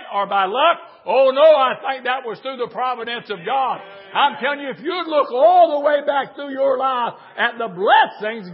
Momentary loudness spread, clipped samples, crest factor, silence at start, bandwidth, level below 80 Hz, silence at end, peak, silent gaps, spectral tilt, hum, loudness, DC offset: 13 LU; under 0.1%; 16 dB; 0 s; 5.6 kHz; -82 dBFS; 0 s; -2 dBFS; none; -8.5 dB/octave; none; -18 LUFS; under 0.1%